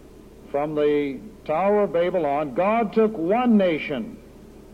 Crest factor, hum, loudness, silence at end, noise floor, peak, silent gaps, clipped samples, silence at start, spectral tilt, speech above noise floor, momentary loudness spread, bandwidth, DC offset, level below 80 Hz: 14 dB; none; -22 LUFS; 0 s; -45 dBFS; -8 dBFS; none; under 0.1%; 0.1 s; -8 dB/octave; 23 dB; 11 LU; 8.6 kHz; under 0.1%; -52 dBFS